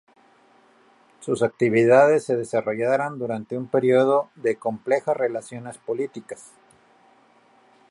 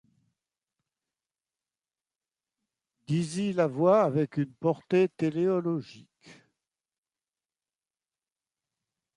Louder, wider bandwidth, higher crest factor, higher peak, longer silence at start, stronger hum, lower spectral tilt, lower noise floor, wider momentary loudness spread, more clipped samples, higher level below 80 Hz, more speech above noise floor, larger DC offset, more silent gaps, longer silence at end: first, -22 LUFS vs -27 LUFS; about the same, 11.5 kHz vs 11 kHz; about the same, 20 dB vs 20 dB; first, -4 dBFS vs -12 dBFS; second, 1.2 s vs 3.1 s; neither; about the same, -6.5 dB/octave vs -7.5 dB/octave; second, -57 dBFS vs under -90 dBFS; first, 18 LU vs 8 LU; neither; first, -70 dBFS vs -76 dBFS; second, 35 dB vs over 63 dB; neither; neither; second, 1.5 s vs 2.85 s